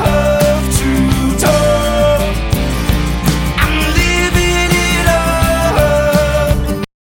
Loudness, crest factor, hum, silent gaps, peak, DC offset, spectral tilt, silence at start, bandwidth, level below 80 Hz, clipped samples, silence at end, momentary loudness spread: -13 LUFS; 12 dB; none; none; 0 dBFS; under 0.1%; -5 dB/octave; 0 s; 17 kHz; -18 dBFS; under 0.1%; 0.25 s; 4 LU